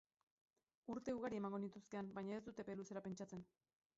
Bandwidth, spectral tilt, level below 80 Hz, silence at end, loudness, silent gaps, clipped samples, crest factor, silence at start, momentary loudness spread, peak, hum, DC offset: 7.6 kHz; -7 dB/octave; -80 dBFS; 0.55 s; -50 LUFS; none; under 0.1%; 16 dB; 0.85 s; 9 LU; -34 dBFS; none; under 0.1%